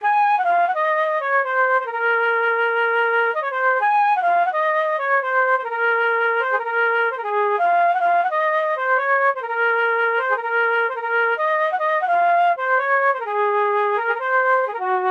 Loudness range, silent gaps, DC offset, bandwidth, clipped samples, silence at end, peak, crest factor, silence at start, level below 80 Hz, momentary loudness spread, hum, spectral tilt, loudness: 1 LU; none; under 0.1%; 7.2 kHz; under 0.1%; 0 s; -8 dBFS; 10 dB; 0 s; -82 dBFS; 3 LU; none; -2 dB/octave; -19 LUFS